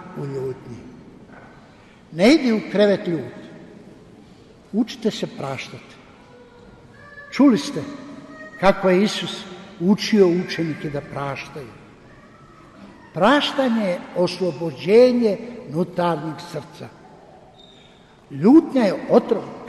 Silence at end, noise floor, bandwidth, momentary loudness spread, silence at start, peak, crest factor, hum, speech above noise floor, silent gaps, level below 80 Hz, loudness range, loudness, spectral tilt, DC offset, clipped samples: 0 s; -49 dBFS; 12.5 kHz; 23 LU; 0 s; -4 dBFS; 18 dB; none; 30 dB; none; -56 dBFS; 9 LU; -20 LUFS; -6 dB/octave; under 0.1%; under 0.1%